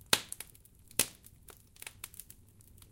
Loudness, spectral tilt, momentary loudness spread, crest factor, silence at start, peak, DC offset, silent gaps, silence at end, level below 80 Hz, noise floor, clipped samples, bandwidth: -35 LUFS; -0.5 dB/octave; 25 LU; 34 dB; 0.1 s; -6 dBFS; under 0.1%; none; 0.85 s; -64 dBFS; -59 dBFS; under 0.1%; 17 kHz